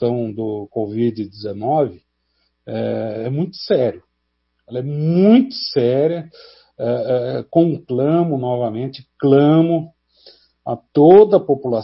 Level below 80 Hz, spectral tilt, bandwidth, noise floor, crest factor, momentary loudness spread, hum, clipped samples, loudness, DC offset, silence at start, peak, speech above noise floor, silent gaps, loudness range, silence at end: -60 dBFS; -11.5 dB/octave; 5.8 kHz; -70 dBFS; 18 dB; 15 LU; none; under 0.1%; -17 LUFS; under 0.1%; 0 s; 0 dBFS; 54 dB; none; 8 LU; 0 s